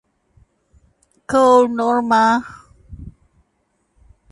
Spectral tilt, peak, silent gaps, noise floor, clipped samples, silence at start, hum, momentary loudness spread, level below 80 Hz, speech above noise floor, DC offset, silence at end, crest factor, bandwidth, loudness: -5 dB/octave; -2 dBFS; none; -67 dBFS; under 0.1%; 1.3 s; none; 26 LU; -48 dBFS; 52 dB; under 0.1%; 1.2 s; 18 dB; 11.5 kHz; -15 LUFS